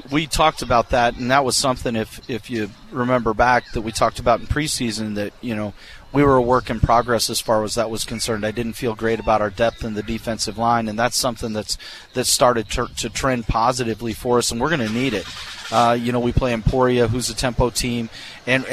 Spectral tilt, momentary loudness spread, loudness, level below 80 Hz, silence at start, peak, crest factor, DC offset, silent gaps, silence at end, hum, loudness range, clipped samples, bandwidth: -4 dB/octave; 10 LU; -20 LUFS; -34 dBFS; 0.05 s; -2 dBFS; 18 dB; under 0.1%; none; 0 s; none; 2 LU; under 0.1%; 15 kHz